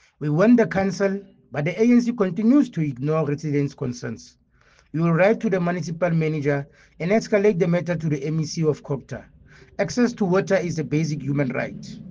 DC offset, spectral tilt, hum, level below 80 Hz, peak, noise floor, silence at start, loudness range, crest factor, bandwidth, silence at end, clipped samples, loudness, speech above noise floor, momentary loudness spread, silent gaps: under 0.1%; -7 dB/octave; none; -56 dBFS; -6 dBFS; -58 dBFS; 0.2 s; 3 LU; 16 dB; 7.6 kHz; 0 s; under 0.1%; -22 LUFS; 36 dB; 13 LU; none